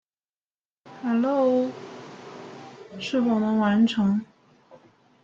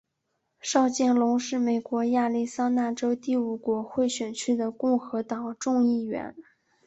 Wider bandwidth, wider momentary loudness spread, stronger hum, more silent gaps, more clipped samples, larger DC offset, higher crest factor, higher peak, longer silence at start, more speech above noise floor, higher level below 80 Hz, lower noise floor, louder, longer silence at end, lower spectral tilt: second, 7.4 kHz vs 8.2 kHz; first, 21 LU vs 8 LU; neither; neither; neither; neither; about the same, 16 dB vs 18 dB; about the same, -10 dBFS vs -8 dBFS; first, 0.85 s vs 0.65 s; first, over 68 dB vs 52 dB; about the same, -66 dBFS vs -70 dBFS; first, under -90 dBFS vs -78 dBFS; about the same, -24 LUFS vs -26 LUFS; first, 1 s vs 0.45 s; first, -7 dB/octave vs -4 dB/octave